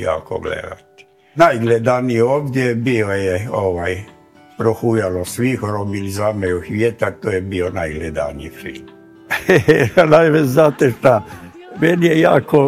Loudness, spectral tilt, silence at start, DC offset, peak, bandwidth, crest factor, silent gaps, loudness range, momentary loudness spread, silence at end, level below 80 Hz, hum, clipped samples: -16 LUFS; -6.5 dB/octave; 0 s; under 0.1%; 0 dBFS; 16 kHz; 16 dB; none; 7 LU; 14 LU; 0 s; -46 dBFS; none; 0.2%